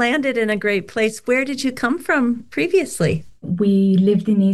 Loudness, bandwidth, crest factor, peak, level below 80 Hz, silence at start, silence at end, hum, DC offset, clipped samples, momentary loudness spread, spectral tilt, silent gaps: -19 LUFS; 12.5 kHz; 12 dB; -6 dBFS; -52 dBFS; 0 s; 0 s; none; 0.5%; under 0.1%; 7 LU; -6 dB/octave; none